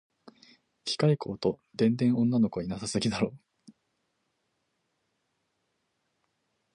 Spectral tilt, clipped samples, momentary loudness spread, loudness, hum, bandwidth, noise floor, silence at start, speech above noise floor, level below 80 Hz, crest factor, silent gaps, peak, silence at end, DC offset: -6 dB/octave; under 0.1%; 9 LU; -28 LUFS; none; 10.5 kHz; -78 dBFS; 0.85 s; 51 dB; -64 dBFS; 20 dB; none; -12 dBFS; 3.35 s; under 0.1%